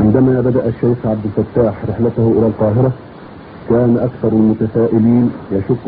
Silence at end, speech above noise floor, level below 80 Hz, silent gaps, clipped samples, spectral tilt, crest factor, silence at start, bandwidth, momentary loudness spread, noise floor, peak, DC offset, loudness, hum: 0 s; 21 dB; -40 dBFS; none; under 0.1%; -10.5 dB/octave; 14 dB; 0 s; 4.6 kHz; 8 LU; -34 dBFS; 0 dBFS; under 0.1%; -14 LUFS; none